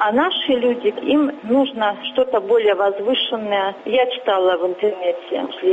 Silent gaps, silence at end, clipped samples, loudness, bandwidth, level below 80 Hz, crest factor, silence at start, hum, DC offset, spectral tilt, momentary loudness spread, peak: none; 0 s; under 0.1%; -19 LUFS; 7.8 kHz; -62 dBFS; 14 dB; 0 s; none; under 0.1%; -6 dB/octave; 4 LU; -4 dBFS